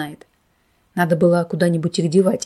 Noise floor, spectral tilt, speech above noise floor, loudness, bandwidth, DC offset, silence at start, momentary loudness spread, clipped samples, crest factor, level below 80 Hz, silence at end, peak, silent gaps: -62 dBFS; -6.5 dB/octave; 45 dB; -18 LUFS; 13 kHz; under 0.1%; 0 s; 10 LU; under 0.1%; 16 dB; -60 dBFS; 0 s; -4 dBFS; none